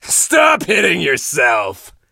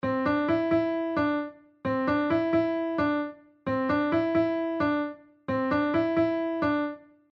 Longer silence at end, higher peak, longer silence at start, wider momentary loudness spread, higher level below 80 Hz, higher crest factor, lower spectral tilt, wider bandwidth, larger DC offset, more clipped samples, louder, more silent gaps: about the same, 0.25 s vs 0.35 s; first, 0 dBFS vs -14 dBFS; about the same, 0.05 s vs 0.05 s; second, 6 LU vs 10 LU; first, -52 dBFS vs -58 dBFS; about the same, 14 dB vs 12 dB; second, -1.5 dB/octave vs -8.5 dB/octave; first, 16.5 kHz vs 6 kHz; neither; neither; first, -13 LUFS vs -27 LUFS; neither